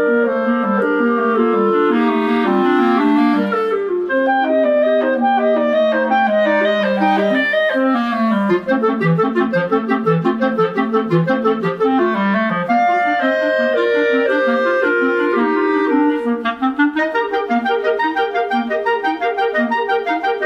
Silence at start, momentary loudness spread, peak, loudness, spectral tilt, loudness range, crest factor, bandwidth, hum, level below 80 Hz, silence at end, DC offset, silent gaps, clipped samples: 0 s; 4 LU; -2 dBFS; -16 LUFS; -7.5 dB/octave; 2 LU; 12 dB; 7.8 kHz; none; -58 dBFS; 0 s; under 0.1%; none; under 0.1%